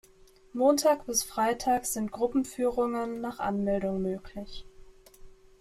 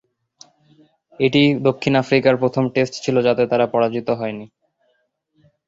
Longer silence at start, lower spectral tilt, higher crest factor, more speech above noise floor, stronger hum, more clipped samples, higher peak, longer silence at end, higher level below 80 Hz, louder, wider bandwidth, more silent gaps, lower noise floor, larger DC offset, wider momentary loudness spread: second, 0.55 s vs 1.2 s; second, -4 dB/octave vs -6.5 dB/octave; about the same, 18 dB vs 18 dB; second, 29 dB vs 50 dB; neither; neither; second, -12 dBFS vs -2 dBFS; second, 0.3 s vs 1.2 s; about the same, -54 dBFS vs -58 dBFS; second, -29 LUFS vs -18 LUFS; first, 15.5 kHz vs 7.8 kHz; neither; second, -57 dBFS vs -67 dBFS; neither; first, 15 LU vs 8 LU